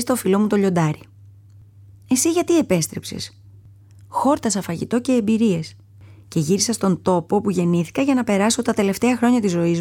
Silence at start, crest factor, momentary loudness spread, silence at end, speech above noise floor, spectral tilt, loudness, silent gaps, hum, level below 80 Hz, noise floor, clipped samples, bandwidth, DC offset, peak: 0 s; 14 dB; 9 LU; 0 s; 27 dB; -5 dB/octave; -20 LUFS; none; none; -56 dBFS; -46 dBFS; under 0.1%; 17.5 kHz; under 0.1%; -6 dBFS